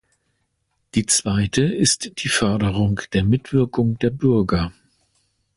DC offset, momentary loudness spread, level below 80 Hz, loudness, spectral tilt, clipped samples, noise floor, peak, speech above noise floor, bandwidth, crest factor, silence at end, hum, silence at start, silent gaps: under 0.1%; 4 LU; -40 dBFS; -20 LUFS; -4.5 dB/octave; under 0.1%; -71 dBFS; -6 dBFS; 52 dB; 11.5 kHz; 16 dB; 0.85 s; none; 0.95 s; none